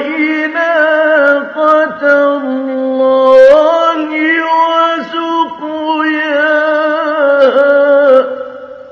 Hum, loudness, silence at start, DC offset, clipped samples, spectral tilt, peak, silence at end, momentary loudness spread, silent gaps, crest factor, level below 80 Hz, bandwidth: none; -10 LUFS; 0 s; under 0.1%; 0.8%; -4 dB/octave; 0 dBFS; 0 s; 9 LU; none; 10 dB; -58 dBFS; 6.8 kHz